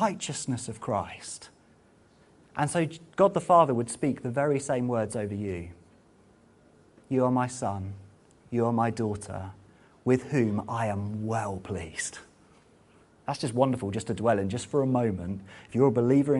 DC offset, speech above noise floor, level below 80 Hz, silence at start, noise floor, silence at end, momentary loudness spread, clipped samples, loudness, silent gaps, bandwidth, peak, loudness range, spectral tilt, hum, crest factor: under 0.1%; 32 dB; -60 dBFS; 0 s; -60 dBFS; 0 s; 15 LU; under 0.1%; -28 LUFS; none; 11.5 kHz; -8 dBFS; 6 LU; -6 dB/octave; none; 20 dB